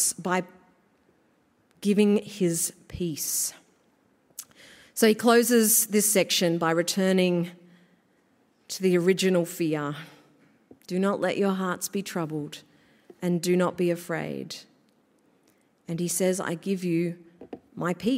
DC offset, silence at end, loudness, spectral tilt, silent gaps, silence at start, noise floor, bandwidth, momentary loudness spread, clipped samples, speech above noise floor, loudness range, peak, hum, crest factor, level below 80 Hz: under 0.1%; 0 s; -25 LUFS; -4 dB/octave; none; 0 s; -66 dBFS; 16 kHz; 19 LU; under 0.1%; 41 dB; 8 LU; -8 dBFS; none; 20 dB; -66 dBFS